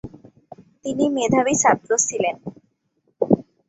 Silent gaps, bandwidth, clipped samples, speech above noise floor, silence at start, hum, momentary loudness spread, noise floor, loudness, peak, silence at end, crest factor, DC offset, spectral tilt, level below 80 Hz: none; 8.2 kHz; under 0.1%; 49 dB; 0.05 s; none; 17 LU; -68 dBFS; -20 LUFS; -2 dBFS; 0.25 s; 20 dB; under 0.1%; -4 dB/octave; -58 dBFS